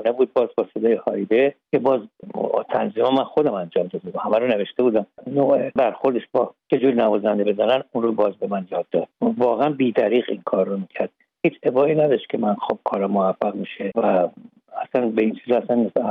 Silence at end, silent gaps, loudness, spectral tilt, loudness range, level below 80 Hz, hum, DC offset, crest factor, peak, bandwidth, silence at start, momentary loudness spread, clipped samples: 0 s; none; -21 LUFS; -9 dB/octave; 2 LU; -70 dBFS; none; under 0.1%; 16 dB; -4 dBFS; 5.2 kHz; 0 s; 7 LU; under 0.1%